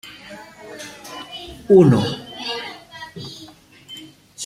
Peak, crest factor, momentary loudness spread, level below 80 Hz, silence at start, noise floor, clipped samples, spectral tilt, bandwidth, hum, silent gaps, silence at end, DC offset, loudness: -2 dBFS; 20 dB; 25 LU; -54 dBFS; 0.3 s; -44 dBFS; under 0.1%; -6.5 dB/octave; 14 kHz; none; none; 0 s; under 0.1%; -17 LUFS